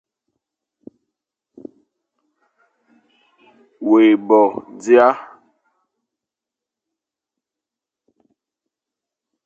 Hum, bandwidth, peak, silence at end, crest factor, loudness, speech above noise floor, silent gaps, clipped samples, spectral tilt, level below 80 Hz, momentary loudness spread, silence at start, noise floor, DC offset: none; 7.8 kHz; 0 dBFS; 4.2 s; 22 dB; -15 LUFS; 73 dB; none; under 0.1%; -5.5 dB/octave; -74 dBFS; 15 LU; 3.8 s; -87 dBFS; under 0.1%